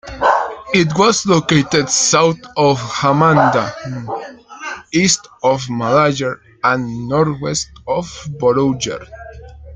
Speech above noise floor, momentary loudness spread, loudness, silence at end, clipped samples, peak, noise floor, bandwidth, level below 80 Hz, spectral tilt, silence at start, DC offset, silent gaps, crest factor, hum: 19 dB; 15 LU; -15 LUFS; 0 s; under 0.1%; 0 dBFS; -35 dBFS; 10 kHz; -46 dBFS; -4 dB/octave; 0.05 s; under 0.1%; none; 16 dB; none